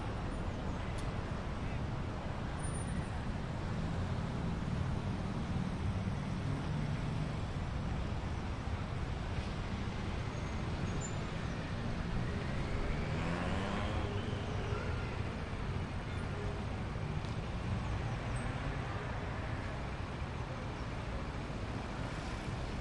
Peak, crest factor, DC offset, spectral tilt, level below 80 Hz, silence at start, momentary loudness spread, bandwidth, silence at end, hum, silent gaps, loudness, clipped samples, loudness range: -24 dBFS; 14 dB; under 0.1%; -6.5 dB/octave; -44 dBFS; 0 s; 4 LU; 11 kHz; 0 s; none; none; -39 LUFS; under 0.1%; 2 LU